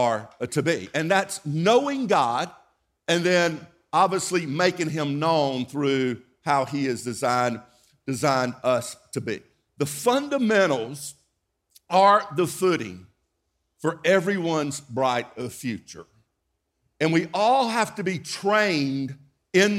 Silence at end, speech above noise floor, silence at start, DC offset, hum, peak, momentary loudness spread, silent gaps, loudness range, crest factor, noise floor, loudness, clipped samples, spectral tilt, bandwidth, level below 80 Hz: 0 s; 53 dB; 0 s; under 0.1%; none; -6 dBFS; 12 LU; none; 4 LU; 18 dB; -77 dBFS; -24 LUFS; under 0.1%; -4.5 dB/octave; 16 kHz; -68 dBFS